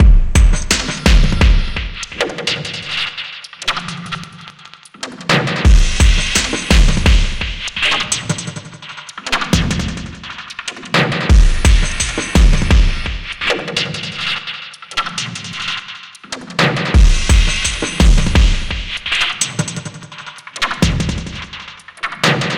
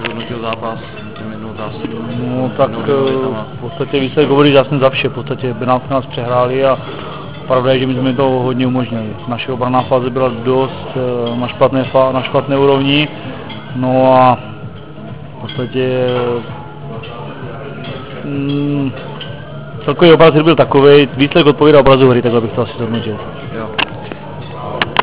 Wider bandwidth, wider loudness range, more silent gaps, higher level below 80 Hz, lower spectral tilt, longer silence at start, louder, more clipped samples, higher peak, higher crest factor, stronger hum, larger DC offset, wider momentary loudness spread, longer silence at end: first, 13.5 kHz vs 4 kHz; second, 6 LU vs 11 LU; neither; first, -16 dBFS vs -42 dBFS; second, -4 dB/octave vs -10.5 dB/octave; about the same, 0 s vs 0 s; second, -16 LUFS vs -13 LUFS; second, under 0.1% vs 0.4%; about the same, 0 dBFS vs 0 dBFS; about the same, 14 dB vs 14 dB; neither; second, under 0.1% vs 2%; second, 15 LU vs 18 LU; about the same, 0 s vs 0 s